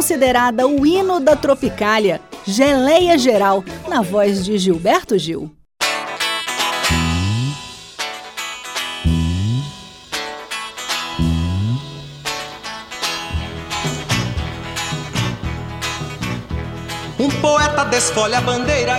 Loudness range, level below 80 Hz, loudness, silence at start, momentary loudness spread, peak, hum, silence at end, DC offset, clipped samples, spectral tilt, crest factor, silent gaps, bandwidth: 8 LU; -34 dBFS; -18 LUFS; 0 s; 12 LU; -2 dBFS; none; 0 s; under 0.1%; under 0.1%; -4.5 dB/octave; 18 dB; none; 17.5 kHz